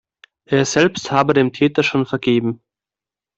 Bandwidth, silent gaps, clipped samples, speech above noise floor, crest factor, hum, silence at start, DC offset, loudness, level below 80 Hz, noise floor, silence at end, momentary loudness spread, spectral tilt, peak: 8.2 kHz; none; under 0.1%; 73 dB; 18 dB; none; 0.5 s; under 0.1%; -17 LUFS; -56 dBFS; -89 dBFS; 0.8 s; 5 LU; -5 dB/octave; 0 dBFS